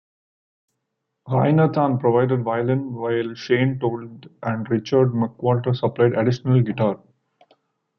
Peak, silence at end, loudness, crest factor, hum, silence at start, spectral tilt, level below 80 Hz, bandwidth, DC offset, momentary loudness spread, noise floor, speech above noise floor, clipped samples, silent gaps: -4 dBFS; 1 s; -21 LUFS; 16 dB; none; 1.25 s; -9 dB/octave; -60 dBFS; 6.4 kHz; under 0.1%; 8 LU; -78 dBFS; 58 dB; under 0.1%; none